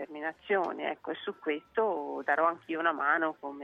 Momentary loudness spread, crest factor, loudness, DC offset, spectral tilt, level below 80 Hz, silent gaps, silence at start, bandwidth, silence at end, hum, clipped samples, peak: 9 LU; 18 dB; -31 LUFS; under 0.1%; -6 dB/octave; -76 dBFS; none; 0 s; 7 kHz; 0 s; none; under 0.1%; -14 dBFS